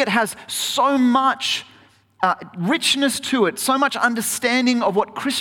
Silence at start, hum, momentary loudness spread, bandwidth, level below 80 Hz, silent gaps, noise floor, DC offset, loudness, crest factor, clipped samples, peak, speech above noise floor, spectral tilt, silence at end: 0 s; none; 6 LU; 18 kHz; -64 dBFS; none; -52 dBFS; under 0.1%; -19 LUFS; 16 dB; under 0.1%; -4 dBFS; 33 dB; -3 dB/octave; 0 s